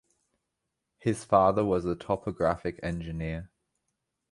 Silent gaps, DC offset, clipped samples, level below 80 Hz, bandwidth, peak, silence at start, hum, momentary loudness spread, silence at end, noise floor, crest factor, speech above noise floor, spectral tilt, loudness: none; under 0.1%; under 0.1%; -50 dBFS; 11.5 kHz; -8 dBFS; 1.05 s; none; 12 LU; 0.85 s; -84 dBFS; 22 dB; 56 dB; -7 dB/octave; -29 LUFS